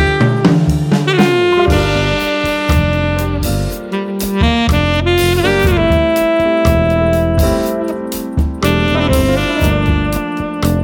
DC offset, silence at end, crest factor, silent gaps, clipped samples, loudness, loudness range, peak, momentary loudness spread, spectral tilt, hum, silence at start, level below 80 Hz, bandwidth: under 0.1%; 0 s; 12 dB; none; under 0.1%; -14 LUFS; 2 LU; 0 dBFS; 7 LU; -6 dB/octave; none; 0 s; -22 dBFS; 19 kHz